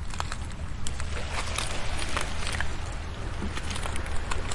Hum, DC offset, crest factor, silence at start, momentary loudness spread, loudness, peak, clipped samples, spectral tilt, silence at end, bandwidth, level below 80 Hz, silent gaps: none; under 0.1%; 16 dB; 0 s; 6 LU; -33 LUFS; -12 dBFS; under 0.1%; -3.5 dB/octave; 0 s; 11.5 kHz; -34 dBFS; none